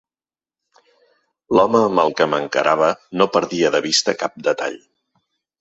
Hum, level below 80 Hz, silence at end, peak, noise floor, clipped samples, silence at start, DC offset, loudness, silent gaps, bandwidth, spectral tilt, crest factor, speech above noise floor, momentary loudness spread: none; -60 dBFS; 0.85 s; 0 dBFS; under -90 dBFS; under 0.1%; 1.5 s; under 0.1%; -18 LUFS; none; 8.2 kHz; -3.5 dB/octave; 20 dB; over 72 dB; 7 LU